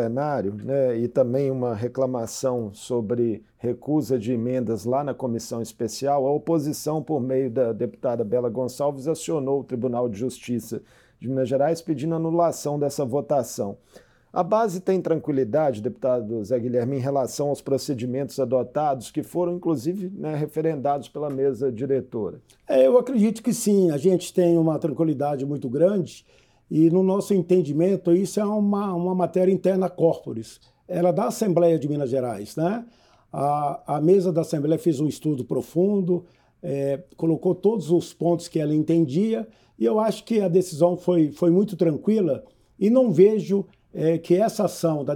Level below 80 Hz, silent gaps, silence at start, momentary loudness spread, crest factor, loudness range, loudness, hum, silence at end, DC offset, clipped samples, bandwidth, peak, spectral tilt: -66 dBFS; none; 0 s; 9 LU; 18 dB; 5 LU; -23 LUFS; none; 0 s; under 0.1%; under 0.1%; 18 kHz; -4 dBFS; -7 dB/octave